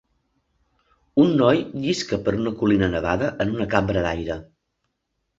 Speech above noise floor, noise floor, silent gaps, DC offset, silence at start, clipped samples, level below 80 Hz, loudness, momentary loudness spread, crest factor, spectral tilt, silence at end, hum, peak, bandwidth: 55 dB; -76 dBFS; none; under 0.1%; 1.15 s; under 0.1%; -44 dBFS; -22 LUFS; 7 LU; 20 dB; -6.5 dB/octave; 0.95 s; none; -2 dBFS; 8 kHz